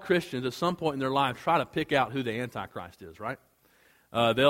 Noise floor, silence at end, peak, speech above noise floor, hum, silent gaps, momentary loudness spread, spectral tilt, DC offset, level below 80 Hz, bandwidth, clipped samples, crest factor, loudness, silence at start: -63 dBFS; 0 s; -8 dBFS; 35 dB; none; none; 13 LU; -5.5 dB/octave; under 0.1%; -62 dBFS; 16.5 kHz; under 0.1%; 22 dB; -29 LUFS; 0 s